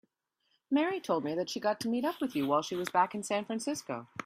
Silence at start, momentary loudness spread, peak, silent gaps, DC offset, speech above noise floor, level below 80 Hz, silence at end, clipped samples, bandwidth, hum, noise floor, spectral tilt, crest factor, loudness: 0.7 s; 5 LU; -14 dBFS; none; under 0.1%; 46 dB; -76 dBFS; 0 s; under 0.1%; 15.5 kHz; none; -78 dBFS; -4.5 dB/octave; 18 dB; -32 LUFS